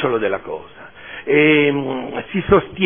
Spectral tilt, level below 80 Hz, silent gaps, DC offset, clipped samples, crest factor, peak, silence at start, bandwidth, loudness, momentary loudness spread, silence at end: -10 dB/octave; -44 dBFS; none; 0.4%; under 0.1%; 16 dB; 0 dBFS; 0 s; 3.6 kHz; -17 LUFS; 18 LU; 0 s